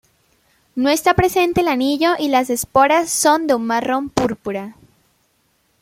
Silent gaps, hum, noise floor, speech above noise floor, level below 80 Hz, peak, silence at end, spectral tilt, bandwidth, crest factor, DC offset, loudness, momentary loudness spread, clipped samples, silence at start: none; none; -63 dBFS; 46 dB; -46 dBFS; -2 dBFS; 1.1 s; -4 dB/octave; 16.5 kHz; 18 dB; under 0.1%; -17 LUFS; 10 LU; under 0.1%; 0.75 s